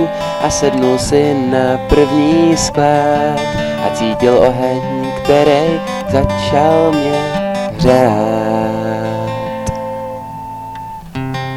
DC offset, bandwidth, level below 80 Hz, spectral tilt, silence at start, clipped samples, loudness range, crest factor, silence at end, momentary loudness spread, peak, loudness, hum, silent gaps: 0.3%; 17 kHz; -34 dBFS; -5.5 dB/octave; 0 s; 0.1%; 4 LU; 14 dB; 0 s; 12 LU; 0 dBFS; -13 LUFS; none; none